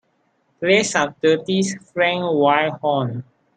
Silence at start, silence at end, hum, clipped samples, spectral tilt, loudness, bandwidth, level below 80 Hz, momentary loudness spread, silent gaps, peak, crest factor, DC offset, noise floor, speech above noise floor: 0.6 s; 0.35 s; none; under 0.1%; -4.5 dB/octave; -19 LUFS; 9.4 kHz; -64 dBFS; 8 LU; none; -2 dBFS; 18 dB; under 0.1%; -65 dBFS; 46 dB